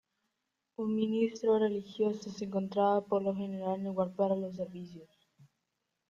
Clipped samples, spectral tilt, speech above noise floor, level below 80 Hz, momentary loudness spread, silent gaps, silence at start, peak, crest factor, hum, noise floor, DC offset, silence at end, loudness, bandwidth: under 0.1%; -7.5 dB/octave; 52 dB; -76 dBFS; 11 LU; none; 0.8 s; -18 dBFS; 16 dB; none; -84 dBFS; under 0.1%; 1.05 s; -33 LUFS; 7.4 kHz